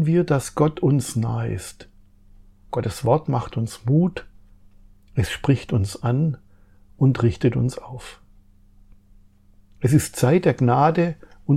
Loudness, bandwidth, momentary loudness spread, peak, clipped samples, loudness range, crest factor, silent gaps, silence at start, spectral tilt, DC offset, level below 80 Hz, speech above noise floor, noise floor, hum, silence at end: -21 LUFS; 15 kHz; 14 LU; -4 dBFS; under 0.1%; 3 LU; 18 dB; none; 0 s; -7 dB/octave; under 0.1%; -48 dBFS; 32 dB; -52 dBFS; none; 0 s